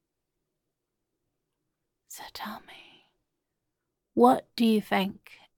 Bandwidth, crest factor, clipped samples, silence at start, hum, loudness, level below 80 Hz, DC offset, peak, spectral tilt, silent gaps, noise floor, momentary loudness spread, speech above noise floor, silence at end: 17.5 kHz; 24 dB; under 0.1%; 2.1 s; none; -25 LUFS; -72 dBFS; under 0.1%; -6 dBFS; -5.5 dB/octave; none; -83 dBFS; 22 LU; 57 dB; 0.45 s